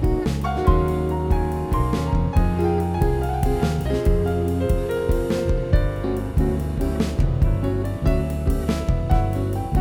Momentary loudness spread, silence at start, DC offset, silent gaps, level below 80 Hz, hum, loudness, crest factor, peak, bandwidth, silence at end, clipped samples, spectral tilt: 3 LU; 0 s; under 0.1%; none; -24 dBFS; none; -22 LUFS; 16 dB; -4 dBFS; 16.5 kHz; 0 s; under 0.1%; -8 dB/octave